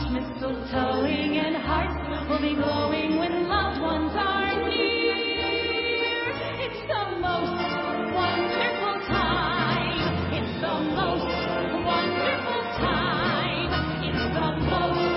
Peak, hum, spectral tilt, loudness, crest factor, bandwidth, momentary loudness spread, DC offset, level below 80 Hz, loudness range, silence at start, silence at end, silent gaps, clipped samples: -10 dBFS; none; -9.5 dB/octave; -25 LUFS; 16 dB; 5.8 kHz; 4 LU; under 0.1%; -40 dBFS; 2 LU; 0 s; 0 s; none; under 0.1%